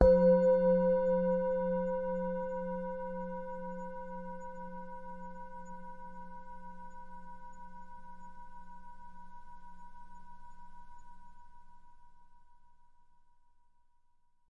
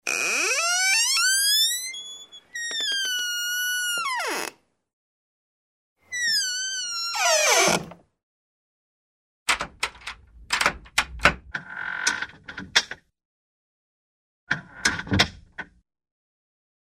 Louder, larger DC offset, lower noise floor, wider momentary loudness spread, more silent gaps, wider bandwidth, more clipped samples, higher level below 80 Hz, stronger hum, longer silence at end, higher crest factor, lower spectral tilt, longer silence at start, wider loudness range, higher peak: second, -32 LUFS vs -23 LUFS; neither; second, -67 dBFS vs under -90 dBFS; first, 27 LU vs 19 LU; second, none vs 4.93-5.96 s, 8.23-9.46 s, 13.25-14.47 s; second, 7.2 kHz vs 16 kHz; neither; about the same, -50 dBFS vs -50 dBFS; neither; first, 1.5 s vs 1.15 s; about the same, 26 dB vs 24 dB; first, -9.5 dB/octave vs -0.5 dB/octave; about the same, 0 s vs 0.05 s; first, 25 LU vs 7 LU; second, -8 dBFS vs -2 dBFS